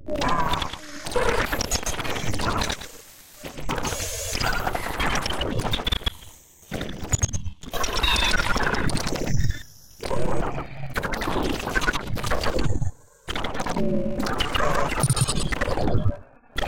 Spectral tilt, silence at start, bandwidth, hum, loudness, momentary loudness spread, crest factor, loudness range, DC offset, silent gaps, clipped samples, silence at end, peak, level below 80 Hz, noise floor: -3.5 dB/octave; 0 s; 17 kHz; none; -26 LUFS; 11 LU; 18 dB; 3 LU; 2%; none; under 0.1%; 0 s; -6 dBFS; -32 dBFS; -47 dBFS